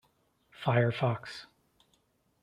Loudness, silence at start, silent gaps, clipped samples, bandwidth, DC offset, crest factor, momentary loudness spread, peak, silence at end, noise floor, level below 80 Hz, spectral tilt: -30 LUFS; 0.6 s; none; under 0.1%; 10 kHz; under 0.1%; 22 dB; 17 LU; -12 dBFS; 1 s; -72 dBFS; -70 dBFS; -7.5 dB/octave